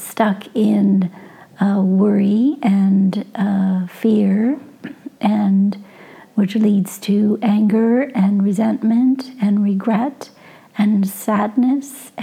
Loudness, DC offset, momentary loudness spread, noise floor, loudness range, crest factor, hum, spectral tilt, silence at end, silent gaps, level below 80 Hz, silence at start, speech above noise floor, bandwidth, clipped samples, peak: -17 LUFS; under 0.1%; 9 LU; -42 dBFS; 2 LU; 16 dB; none; -7.5 dB/octave; 0 s; none; -72 dBFS; 0 s; 26 dB; 15 kHz; under 0.1%; -2 dBFS